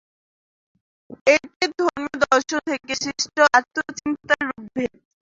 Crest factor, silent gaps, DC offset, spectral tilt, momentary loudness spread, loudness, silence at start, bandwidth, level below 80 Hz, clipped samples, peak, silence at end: 20 dB; 1.21-1.25 s, 1.56-1.60 s; under 0.1%; -2 dB/octave; 12 LU; -21 LUFS; 1.1 s; 7.8 kHz; -60 dBFS; under 0.1%; -2 dBFS; 0.35 s